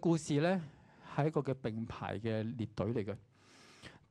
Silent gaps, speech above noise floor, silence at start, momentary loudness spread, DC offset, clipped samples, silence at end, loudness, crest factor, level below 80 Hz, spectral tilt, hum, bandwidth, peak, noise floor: none; 26 dB; 0 s; 19 LU; under 0.1%; under 0.1%; 0.15 s; -37 LUFS; 20 dB; -68 dBFS; -7 dB/octave; none; 11 kHz; -18 dBFS; -61 dBFS